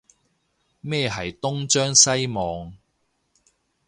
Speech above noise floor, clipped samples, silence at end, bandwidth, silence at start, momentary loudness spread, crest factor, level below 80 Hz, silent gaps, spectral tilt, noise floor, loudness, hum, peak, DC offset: 49 dB; under 0.1%; 1.1 s; 11.5 kHz; 0.85 s; 20 LU; 24 dB; -52 dBFS; none; -2.5 dB/octave; -71 dBFS; -20 LUFS; none; 0 dBFS; under 0.1%